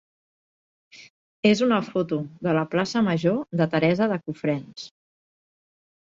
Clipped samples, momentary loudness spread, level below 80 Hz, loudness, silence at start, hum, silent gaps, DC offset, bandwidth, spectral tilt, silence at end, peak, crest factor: under 0.1%; 8 LU; -66 dBFS; -24 LUFS; 0.95 s; none; 1.10-1.43 s; under 0.1%; 7.8 kHz; -6.5 dB/octave; 1.15 s; -8 dBFS; 18 dB